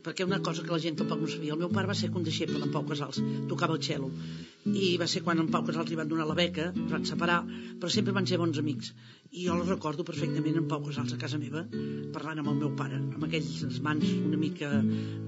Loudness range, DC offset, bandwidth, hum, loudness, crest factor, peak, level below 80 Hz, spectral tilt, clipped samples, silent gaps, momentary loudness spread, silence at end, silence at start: 3 LU; under 0.1%; 7.6 kHz; none; -31 LUFS; 20 dB; -12 dBFS; -70 dBFS; -5 dB/octave; under 0.1%; none; 8 LU; 0 s; 0.05 s